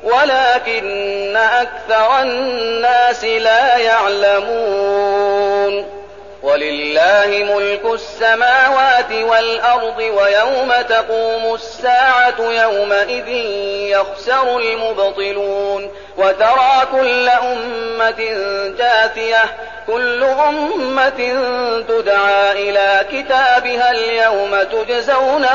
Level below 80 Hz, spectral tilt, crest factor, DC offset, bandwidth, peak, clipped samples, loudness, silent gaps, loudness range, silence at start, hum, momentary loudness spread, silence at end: -50 dBFS; -2.5 dB/octave; 12 dB; 0.6%; 7.4 kHz; -2 dBFS; under 0.1%; -14 LUFS; none; 3 LU; 0 s; none; 8 LU; 0 s